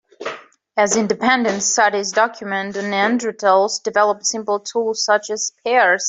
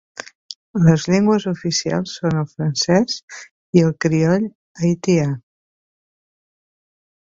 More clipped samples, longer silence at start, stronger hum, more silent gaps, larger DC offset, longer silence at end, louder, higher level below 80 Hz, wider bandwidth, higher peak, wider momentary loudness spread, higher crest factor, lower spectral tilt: neither; second, 0.2 s vs 0.5 s; neither; second, none vs 0.55-0.74 s, 3.23-3.28 s, 3.51-3.73 s, 4.55-4.75 s; neither; second, 0 s vs 1.9 s; about the same, -18 LUFS vs -18 LUFS; second, -64 dBFS vs -54 dBFS; first, 8.4 kHz vs 7.6 kHz; about the same, -2 dBFS vs 0 dBFS; second, 8 LU vs 18 LU; about the same, 16 dB vs 20 dB; second, -2 dB/octave vs -6 dB/octave